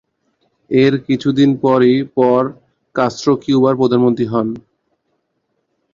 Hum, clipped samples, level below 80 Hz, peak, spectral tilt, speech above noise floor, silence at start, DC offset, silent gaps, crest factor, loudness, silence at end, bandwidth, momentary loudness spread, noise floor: none; under 0.1%; -56 dBFS; -2 dBFS; -7 dB/octave; 55 dB; 0.7 s; under 0.1%; none; 14 dB; -15 LUFS; 1.35 s; 7.6 kHz; 7 LU; -69 dBFS